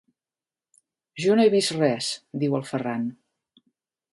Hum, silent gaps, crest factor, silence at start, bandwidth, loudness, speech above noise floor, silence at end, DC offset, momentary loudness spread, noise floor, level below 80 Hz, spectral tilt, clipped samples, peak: none; none; 18 dB; 1.15 s; 11.5 kHz; -24 LUFS; over 67 dB; 1 s; under 0.1%; 12 LU; under -90 dBFS; -74 dBFS; -5 dB/octave; under 0.1%; -8 dBFS